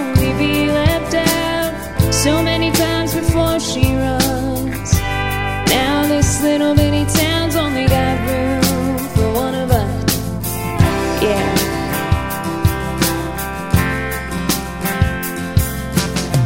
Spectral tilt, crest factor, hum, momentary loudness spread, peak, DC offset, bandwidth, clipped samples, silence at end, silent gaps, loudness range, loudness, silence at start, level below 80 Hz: -5 dB/octave; 16 dB; none; 5 LU; 0 dBFS; 0.8%; 16.5 kHz; under 0.1%; 0 s; none; 4 LU; -17 LUFS; 0 s; -28 dBFS